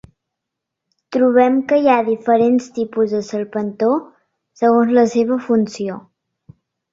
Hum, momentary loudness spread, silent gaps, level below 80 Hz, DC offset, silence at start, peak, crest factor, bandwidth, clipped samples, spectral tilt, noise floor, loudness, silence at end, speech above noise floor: none; 10 LU; none; -60 dBFS; under 0.1%; 1.1 s; -2 dBFS; 16 dB; 7.8 kHz; under 0.1%; -6.5 dB/octave; -81 dBFS; -16 LUFS; 0.95 s; 65 dB